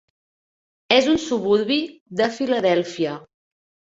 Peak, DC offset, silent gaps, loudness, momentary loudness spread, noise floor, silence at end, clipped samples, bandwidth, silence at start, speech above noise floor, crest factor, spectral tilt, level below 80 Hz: -2 dBFS; under 0.1%; 2.01-2.06 s; -21 LUFS; 10 LU; under -90 dBFS; 0.75 s; under 0.1%; 8 kHz; 0.9 s; over 70 dB; 20 dB; -4.5 dB/octave; -58 dBFS